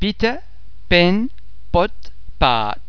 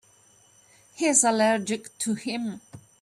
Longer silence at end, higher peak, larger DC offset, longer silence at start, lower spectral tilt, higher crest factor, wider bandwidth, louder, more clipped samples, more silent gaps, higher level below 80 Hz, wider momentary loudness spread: second, 0 s vs 0.25 s; first, 0 dBFS vs -6 dBFS; first, 7% vs under 0.1%; second, 0 s vs 0.95 s; first, -6.5 dB/octave vs -2.5 dB/octave; about the same, 20 dB vs 20 dB; second, 5.4 kHz vs 13.5 kHz; first, -18 LUFS vs -24 LUFS; neither; neither; first, -30 dBFS vs -72 dBFS; second, 10 LU vs 13 LU